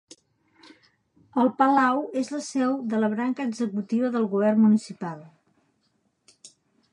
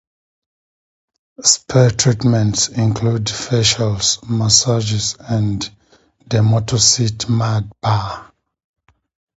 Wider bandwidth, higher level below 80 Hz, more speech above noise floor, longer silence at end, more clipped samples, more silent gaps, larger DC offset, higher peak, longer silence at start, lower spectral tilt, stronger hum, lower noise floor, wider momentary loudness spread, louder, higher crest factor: first, 10.5 kHz vs 8.2 kHz; second, -80 dBFS vs -44 dBFS; first, 48 dB vs 35 dB; second, 0.45 s vs 1.15 s; neither; neither; neither; second, -6 dBFS vs 0 dBFS; about the same, 1.35 s vs 1.4 s; first, -6.5 dB/octave vs -4 dB/octave; neither; first, -71 dBFS vs -50 dBFS; first, 11 LU vs 8 LU; second, -24 LUFS vs -15 LUFS; about the same, 20 dB vs 18 dB